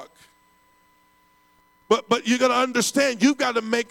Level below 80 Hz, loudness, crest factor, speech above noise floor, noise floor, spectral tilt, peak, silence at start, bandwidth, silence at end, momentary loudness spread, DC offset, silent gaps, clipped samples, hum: -72 dBFS; -21 LUFS; 18 dB; 39 dB; -60 dBFS; -3 dB/octave; -6 dBFS; 0 s; 16.5 kHz; 0.05 s; 4 LU; under 0.1%; none; under 0.1%; none